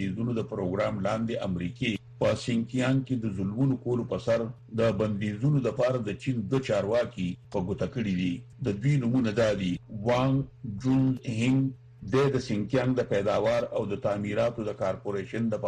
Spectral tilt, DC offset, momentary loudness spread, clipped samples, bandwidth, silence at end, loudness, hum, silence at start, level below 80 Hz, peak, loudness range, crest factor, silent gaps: -7.5 dB/octave; under 0.1%; 7 LU; under 0.1%; 9.8 kHz; 0 s; -28 LUFS; none; 0 s; -56 dBFS; -12 dBFS; 2 LU; 16 dB; none